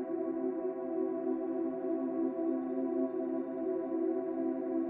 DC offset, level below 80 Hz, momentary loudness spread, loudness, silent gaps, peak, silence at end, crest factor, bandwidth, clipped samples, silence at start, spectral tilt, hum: under 0.1%; -84 dBFS; 2 LU; -35 LUFS; none; -22 dBFS; 0 s; 12 dB; 2.8 kHz; under 0.1%; 0 s; -8.5 dB/octave; none